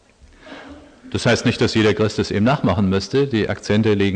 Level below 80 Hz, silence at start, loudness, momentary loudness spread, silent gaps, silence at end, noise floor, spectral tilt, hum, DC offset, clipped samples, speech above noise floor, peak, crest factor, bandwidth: -46 dBFS; 0.45 s; -18 LUFS; 11 LU; none; 0 s; -46 dBFS; -6 dB/octave; none; under 0.1%; under 0.1%; 28 dB; -6 dBFS; 14 dB; 9.8 kHz